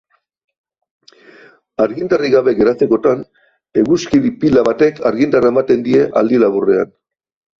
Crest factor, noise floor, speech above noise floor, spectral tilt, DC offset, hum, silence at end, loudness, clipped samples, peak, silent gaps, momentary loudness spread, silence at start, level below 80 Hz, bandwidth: 14 dB; -44 dBFS; 32 dB; -7 dB/octave; under 0.1%; none; 0.75 s; -14 LUFS; under 0.1%; -2 dBFS; none; 6 LU; 1.8 s; -50 dBFS; 7.4 kHz